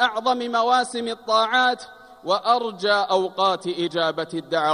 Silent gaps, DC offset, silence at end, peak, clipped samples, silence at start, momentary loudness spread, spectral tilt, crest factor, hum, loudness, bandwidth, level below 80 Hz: none; under 0.1%; 0 s; -6 dBFS; under 0.1%; 0 s; 9 LU; -3.5 dB/octave; 16 dB; none; -22 LUFS; 11.5 kHz; -70 dBFS